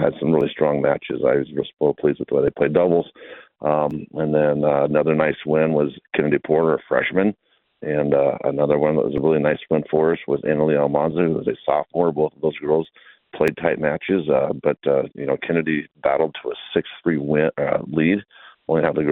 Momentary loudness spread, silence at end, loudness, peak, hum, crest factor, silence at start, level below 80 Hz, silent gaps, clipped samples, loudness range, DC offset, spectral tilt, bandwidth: 6 LU; 0 s; -20 LUFS; -2 dBFS; none; 18 dB; 0 s; -54 dBFS; none; under 0.1%; 2 LU; under 0.1%; -9 dB/octave; 4.6 kHz